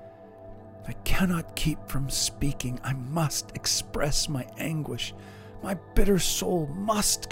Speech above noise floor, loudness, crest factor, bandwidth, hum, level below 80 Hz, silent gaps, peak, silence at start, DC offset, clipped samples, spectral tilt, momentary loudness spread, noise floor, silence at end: 19 dB; -28 LUFS; 22 dB; 16 kHz; none; -36 dBFS; none; -6 dBFS; 0 s; under 0.1%; under 0.1%; -4 dB/octave; 19 LU; -46 dBFS; 0 s